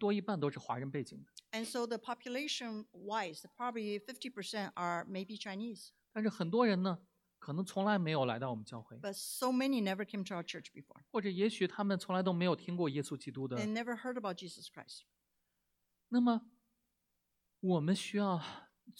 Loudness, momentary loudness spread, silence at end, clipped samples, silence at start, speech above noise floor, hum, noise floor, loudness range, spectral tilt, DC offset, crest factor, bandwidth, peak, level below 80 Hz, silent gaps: -38 LUFS; 13 LU; 0.1 s; under 0.1%; 0 s; 47 dB; none; -84 dBFS; 5 LU; -5.5 dB/octave; under 0.1%; 18 dB; 16 kHz; -20 dBFS; -84 dBFS; none